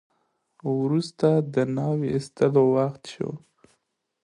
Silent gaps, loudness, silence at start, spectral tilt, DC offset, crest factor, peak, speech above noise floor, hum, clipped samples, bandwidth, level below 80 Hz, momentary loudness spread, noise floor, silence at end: none; -24 LUFS; 0.65 s; -8 dB/octave; under 0.1%; 18 dB; -8 dBFS; 51 dB; none; under 0.1%; 11 kHz; -64 dBFS; 13 LU; -75 dBFS; 0.85 s